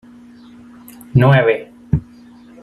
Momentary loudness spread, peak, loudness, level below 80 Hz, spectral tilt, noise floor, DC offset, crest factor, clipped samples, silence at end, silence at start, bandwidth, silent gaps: 10 LU; 0 dBFS; -15 LUFS; -40 dBFS; -8.5 dB/octave; -42 dBFS; under 0.1%; 18 dB; under 0.1%; 0.6 s; 1.15 s; 13 kHz; none